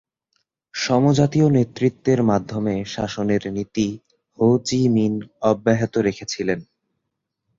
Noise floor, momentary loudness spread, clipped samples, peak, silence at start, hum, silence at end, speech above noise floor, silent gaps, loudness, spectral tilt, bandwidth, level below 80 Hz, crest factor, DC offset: -79 dBFS; 9 LU; under 0.1%; -2 dBFS; 0.75 s; none; 0.95 s; 59 dB; none; -20 LUFS; -6.5 dB/octave; 7.8 kHz; -52 dBFS; 18 dB; under 0.1%